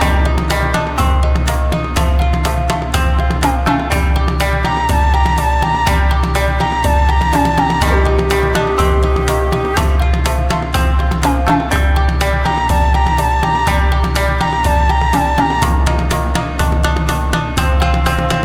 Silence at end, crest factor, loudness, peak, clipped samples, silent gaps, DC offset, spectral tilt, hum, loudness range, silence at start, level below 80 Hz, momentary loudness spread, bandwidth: 0 s; 12 dB; -15 LUFS; 0 dBFS; under 0.1%; none; under 0.1%; -5.5 dB/octave; none; 2 LU; 0 s; -16 dBFS; 3 LU; 16 kHz